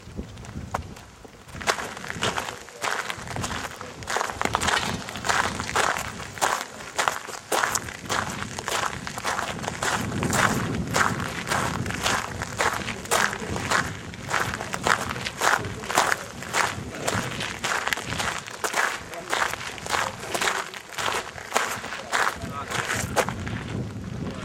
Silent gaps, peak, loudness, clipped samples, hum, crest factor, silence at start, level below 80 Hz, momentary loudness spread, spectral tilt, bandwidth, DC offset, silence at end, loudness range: none; -2 dBFS; -26 LUFS; under 0.1%; none; 26 dB; 0 s; -48 dBFS; 10 LU; -2.5 dB/octave; 16.5 kHz; under 0.1%; 0 s; 3 LU